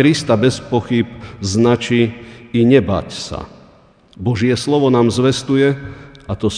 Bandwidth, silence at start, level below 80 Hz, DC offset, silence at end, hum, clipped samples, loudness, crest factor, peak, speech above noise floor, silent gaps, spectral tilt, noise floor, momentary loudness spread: 10 kHz; 0 s; -44 dBFS; under 0.1%; 0 s; none; under 0.1%; -16 LUFS; 16 dB; 0 dBFS; 33 dB; none; -6 dB/octave; -48 dBFS; 15 LU